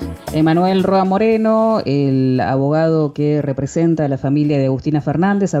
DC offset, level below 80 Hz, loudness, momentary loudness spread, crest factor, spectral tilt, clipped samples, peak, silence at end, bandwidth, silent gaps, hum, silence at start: under 0.1%; -44 dBFS; -16 LUFS; 4 LU; 10 dB; -8 dB/octave; under 0.1%; -6 dBFS; 0 s; 14.5 kHz; none; none; 0 s